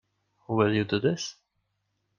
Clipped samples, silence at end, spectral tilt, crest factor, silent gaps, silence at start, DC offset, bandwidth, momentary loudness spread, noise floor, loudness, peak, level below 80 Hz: under 0.1%; 0.85 s; -5.5 dB/octave; 20 dB; none; 0.5 s; under 0.1%; 7.4 kHz; 9 LU; -77 dBFS; -27 LUFS; -10 dBFS; -64 dBFS